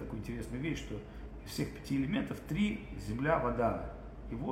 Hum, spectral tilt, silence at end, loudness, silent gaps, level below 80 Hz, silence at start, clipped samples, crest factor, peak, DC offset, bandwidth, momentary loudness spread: none; -6.5 dB/octave; 0 s; -36 LUFS; none; -48 dBFS; 0 s; under 0.1%; 18 dB; -18 dBFS; under 0.1%; 16.5 kHz; 13 LU